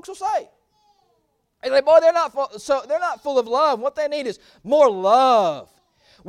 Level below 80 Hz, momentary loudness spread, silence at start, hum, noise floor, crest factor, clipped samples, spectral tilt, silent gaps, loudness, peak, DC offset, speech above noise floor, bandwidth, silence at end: -66 dBFS; 13 LU; 0.1 s; none; -68 dBFS; 18 dB; under 0.1%; -3.5 dB/octave; none; -19 LUFS; -2 dBFS; under 0.1%; 49 dB; 12 kHz; 0.65 s